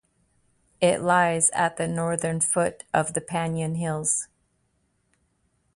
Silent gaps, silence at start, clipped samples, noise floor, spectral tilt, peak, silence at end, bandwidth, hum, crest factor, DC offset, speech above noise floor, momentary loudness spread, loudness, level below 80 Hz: none; 0.8 s; under 0.1%; -70 dBFS; -4 dB/octave; -6 dBFS; 1.5 s; 11.5 kHz; none; 20 dB; under 0.1%; 46 dB; 7 LU; -24 LUFS; -60 dBFS